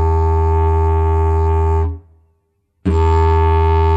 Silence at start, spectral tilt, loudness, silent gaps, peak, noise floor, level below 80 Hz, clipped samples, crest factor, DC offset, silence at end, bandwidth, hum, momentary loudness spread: 0 s; -9 dB/octave; -15 LUFS; none; -4 dBFS; -64 dBFS; -18 dBFS; under 0.1%; 10 dB; under 0.1%; 0 s; 7.6 kHz; none; 6 LU